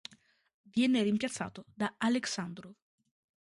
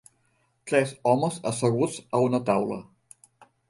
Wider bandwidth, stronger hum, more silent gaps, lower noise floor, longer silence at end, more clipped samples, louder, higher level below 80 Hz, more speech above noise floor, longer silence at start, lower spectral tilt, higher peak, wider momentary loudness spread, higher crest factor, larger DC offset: about the same, 11.5 kHz vs 11.5 kHz; neither; neither; second, -65 dBFS vs -69 dBFS; second, 0.7 s vs 0.9 s; neither; second, -33 LUFS vs -25 LUFS; second, -72 dBFS vs -66 dBFS; second, 33 dB vs 44 dB; about the same, 0.75 s vs 0.65 s; second, -4.5 dB/octave vs -6 dB/octave; second, -16 dBFS vs -8 dBFS; first, 15 LU vs 7 LU; about the same, 18 dB vs 20 dB; neither